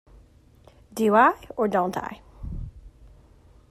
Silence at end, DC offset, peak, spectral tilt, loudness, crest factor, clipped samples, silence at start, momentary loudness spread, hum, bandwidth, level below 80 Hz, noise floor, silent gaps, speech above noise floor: 0.85 s; under 0.1%; -6 dBFS; -6 dB/octave; -22 LUFS; 20 dB; under 0.1%; 0.95 s; 21 LU; none; 15 kHz; -46 dBFS; -54 dBFS; none; 32 dB